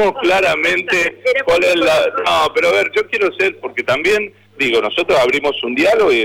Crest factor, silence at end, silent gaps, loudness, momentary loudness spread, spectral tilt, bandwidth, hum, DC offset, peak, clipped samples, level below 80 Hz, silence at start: 8 dB; 0 s; none; -14 LUFS; 5 LU; -3.5 dB/octave; 16.5 kHz; none; under 0.1%; -8 dBFS; under 0.1%; -48 dBFS; 0 s